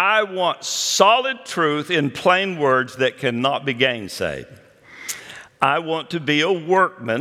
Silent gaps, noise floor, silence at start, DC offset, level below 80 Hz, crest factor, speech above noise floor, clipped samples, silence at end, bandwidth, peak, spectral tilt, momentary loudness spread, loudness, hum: none; -39 dBFS; 0 s; under 0.1%; -62 dBFS; 20 dB; 19 dB; under 0.1%; 0 s; 16.5 kHz; 0 dBFS; -3.5 dB/octave; 13 LU; -19 LUFS; none